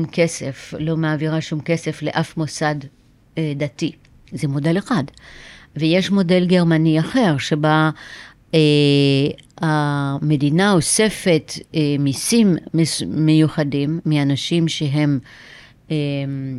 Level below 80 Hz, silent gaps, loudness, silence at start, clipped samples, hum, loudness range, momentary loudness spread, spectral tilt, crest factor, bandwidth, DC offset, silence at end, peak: -52 dBFS; none; -18 LUFS; 0 s; under 0.1%; none; 7 LU; 11 LU; -5.5 dB/octave; 16 dB; 13.5 kHz; under 0.1%; 0 s; -4 dBFS